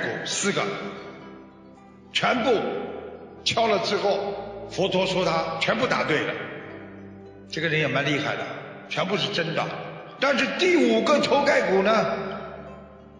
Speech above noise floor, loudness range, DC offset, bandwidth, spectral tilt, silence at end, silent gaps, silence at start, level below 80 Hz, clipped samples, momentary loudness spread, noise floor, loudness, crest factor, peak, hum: 25 dB; 5 LU; under 0.1%; 10.5 kHz; -4 dB/octave; 0 s; none; 0 s; -60 dBFS; under 0.1%; 20 LU; -48 dBFS; -24 LUFS; 18 dB; -6 dBFS; none